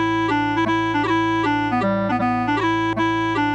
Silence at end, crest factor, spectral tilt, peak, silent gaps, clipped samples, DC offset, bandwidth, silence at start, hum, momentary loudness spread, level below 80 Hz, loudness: 0 s; 10 dB; -6 dB/octave; -10 dBFS; none; under 0.1%; under 0.1%; 8.8 kHz; 0 s; none; 1 LU; -46 dBFS; -20 LUFS